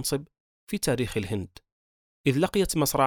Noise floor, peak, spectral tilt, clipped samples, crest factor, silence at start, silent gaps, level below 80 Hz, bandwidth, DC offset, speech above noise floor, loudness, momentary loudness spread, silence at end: under -90 dBFS; -8 dBFS; -4.5 dB/octave; under 0.1%; 20 dB; 0 s; 0.40-0.67 s, 1.72-2.24 s; -48 dBFS; over 20 kHz; under 0.1%; over 64 dB; -27 LUFS; 10 LU; 0 s